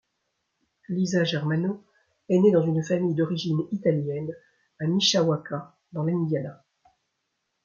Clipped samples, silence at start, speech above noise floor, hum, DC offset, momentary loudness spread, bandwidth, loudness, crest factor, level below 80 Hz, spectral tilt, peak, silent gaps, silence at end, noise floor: under 0.1%; 0.9 s; 54 dB; none; under 0.1%; 15 LU; 7.4 kHz; -25 LUFS; 18 dB; -70 dBFS; -5.5 dB/octave; -8 dBFS; none; 1.1 s; -78 dBFS